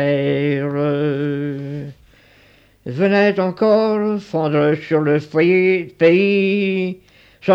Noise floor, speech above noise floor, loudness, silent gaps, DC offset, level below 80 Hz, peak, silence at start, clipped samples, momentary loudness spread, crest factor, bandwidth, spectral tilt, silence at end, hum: -51 dBFS; 35 dB; -17 LUFS; none; under 0.1%; -58 dBFS; -2 dBFS; 0 s; under 0.1%; 13 LU; 14 dB; 7.6 kHz; -8.5 dB/octave; 0 s; none